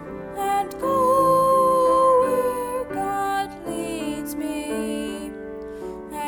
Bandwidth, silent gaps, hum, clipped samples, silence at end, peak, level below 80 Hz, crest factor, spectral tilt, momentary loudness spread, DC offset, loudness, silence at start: 20 kHz; none; none; under 0.1%; 0 s; -8 dBFS; -50 dBFS; 14 dB; -5 dB/octave; 17 LU; under 0.1%; -22 LUFS; 0 s